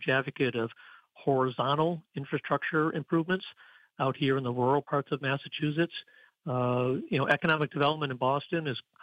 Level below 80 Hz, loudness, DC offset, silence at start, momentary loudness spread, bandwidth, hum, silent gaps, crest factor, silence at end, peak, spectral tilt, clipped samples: -72 dBFS; -30 LUFS; under 0.1%; 0 s; 8 LU; 8.8 kHz; none; none; 18 dB; 0.25 s; -12 dBFS; -8 dB/octave; under 0.1%